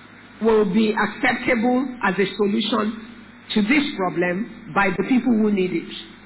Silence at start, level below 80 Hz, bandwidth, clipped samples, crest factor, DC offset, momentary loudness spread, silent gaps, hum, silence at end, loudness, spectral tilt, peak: 0 s; -54 dBFS; 4 kHz; under 0.1%; 12 dB; under 0.1%; 8 LU; none; none; 0.1 s; -21 LUFS; -9.5 dB/octave; -8 dBFS